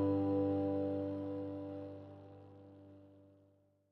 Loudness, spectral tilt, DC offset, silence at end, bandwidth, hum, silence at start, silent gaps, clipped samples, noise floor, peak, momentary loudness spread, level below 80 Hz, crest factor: -38 LUFS; -11 dB/octave; under 0.1%; 0.7 s; 4.5 kHz; none; 0 s; none; under 0.1%; -71 dBFS; -24 dBFS; 24 LU; -78 dBFS; 16 dB